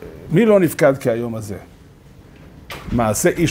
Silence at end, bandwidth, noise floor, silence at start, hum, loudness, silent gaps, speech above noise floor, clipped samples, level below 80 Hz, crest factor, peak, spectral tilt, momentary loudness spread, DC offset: 0 s; 16 kHz; -44 dBFS; 0 s; none; -17 LUFS; none; 28 dB; under 0.1%; -40 dBFS; 18 dB; 0 dBFS; -5.5 dB/octave; 20 LU; under 0.1%